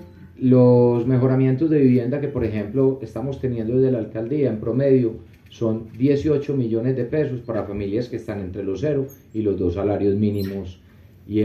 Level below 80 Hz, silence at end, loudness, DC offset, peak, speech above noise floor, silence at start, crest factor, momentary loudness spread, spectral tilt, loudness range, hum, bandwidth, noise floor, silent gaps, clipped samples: -52 dBFS; 0 s; -21 LUFS; under 0.1%; -4 dBFS; 20 dB; 0 s; 16 dB; 11 LU; -10 dB/octave; 6 LU; none; 13 kHz; -40 dBFS; none; under 0.1%